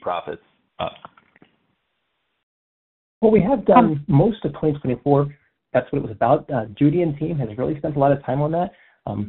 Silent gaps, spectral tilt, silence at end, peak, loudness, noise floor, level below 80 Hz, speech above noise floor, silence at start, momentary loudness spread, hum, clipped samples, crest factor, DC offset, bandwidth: 2.43-3.21 s; -8 dB/octave; 0 s; 0 dBFS; -20 LUFS; -73 dBFS; -48 dBFS; 54 dB; 0.05 s; 15 LU; none; under 0.1%; 20 dB; under 0.1%; 4.1 kHz